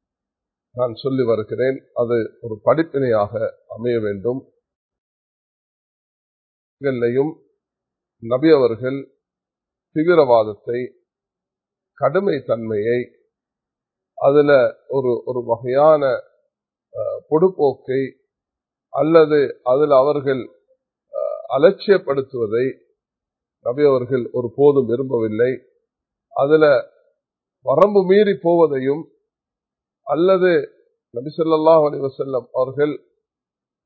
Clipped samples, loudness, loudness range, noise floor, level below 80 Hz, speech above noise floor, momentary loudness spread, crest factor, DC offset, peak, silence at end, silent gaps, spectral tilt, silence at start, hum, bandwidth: under 0.1%; -18 LUFS; 7 LU; -88 dBFS; -62 dBFS; 71 dB; 13 LU; 20 dB; under 0.1%; 0 dBFS; 0.9 s; 4.75-4.89 s, 4.98-6.77 s; -10 dB/octave; 0.75 s; none; 4.5 kHz